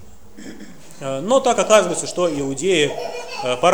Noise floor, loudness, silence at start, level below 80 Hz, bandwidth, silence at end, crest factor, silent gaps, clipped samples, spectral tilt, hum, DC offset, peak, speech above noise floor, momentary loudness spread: -40 dBFS; -19 LUFS; 0.35 s; -54 dBFS; over 20 kHz; 0 s; 20 dB; none; under 0.1%; -3.5 dB/octave; none; 1%; 0 dBFS; 22 dB; 23 LU